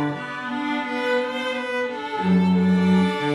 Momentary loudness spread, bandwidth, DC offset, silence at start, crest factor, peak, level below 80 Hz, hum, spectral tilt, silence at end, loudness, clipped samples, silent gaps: 9 LU; 10.5 kHz; under 0.1%; 0 s; 12 dB; -8 dBFS; -62 dBFS; none; -7 dB/octave; 0 s; -22 LUFS; under 0.1%; none